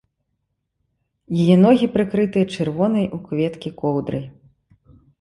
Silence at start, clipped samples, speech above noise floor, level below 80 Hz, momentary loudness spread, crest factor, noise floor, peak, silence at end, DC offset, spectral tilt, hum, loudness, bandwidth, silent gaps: 1.3 s; under 0.1%; 56 dB; -54 dBFS; 12 LU; 18 dB; -74 dBFS; -2 dBFS; 0.9 s; under 0.1%; -8 dB/octave; none; -19 LUFS; 11.5 kHz; none